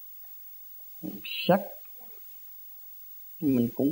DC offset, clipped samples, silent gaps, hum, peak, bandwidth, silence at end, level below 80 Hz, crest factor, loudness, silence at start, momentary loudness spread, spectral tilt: under 0.1%; under 0.1%; none; none; -10 dBFS; 16.5 kHz; 0 s; -68 dBFS; 22 dB; -32 LUFS; 0 s; 16 LU; -6.5 dB/octave